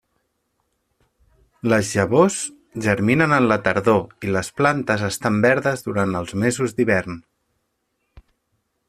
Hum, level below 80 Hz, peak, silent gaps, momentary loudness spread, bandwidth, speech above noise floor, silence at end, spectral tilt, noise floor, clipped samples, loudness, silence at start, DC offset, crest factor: none; -54 dBFS; -2 dBFS; none; 8 LU; 14.5 kHz; 53 dB; 1.7 s; -5.5 dB/octave; -73 dBFS; under 0.1%; -20 LUFS; 1.65 s; under 0.1%; 20 dB